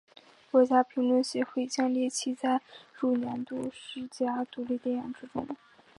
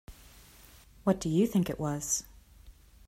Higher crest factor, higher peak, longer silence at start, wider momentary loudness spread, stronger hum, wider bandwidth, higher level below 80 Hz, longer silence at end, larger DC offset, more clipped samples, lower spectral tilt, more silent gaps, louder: about the same, 20 dB vs 20 dB; first, -10 dBFS vs -14 dBFS; first, 0.55 s vs 0.1 s; first, 13 LU vs 6 LU; neither; second, 11.5 kHz vs 16 kHz; second, -74 dBFS vs -54 dBFS; about the same, 0.45 s vs 0.35 s; neither; neither; second, -4 dB/octave vs -5.5 dB/octave; neither; about the same, -30 LUFS vs -30 LUFS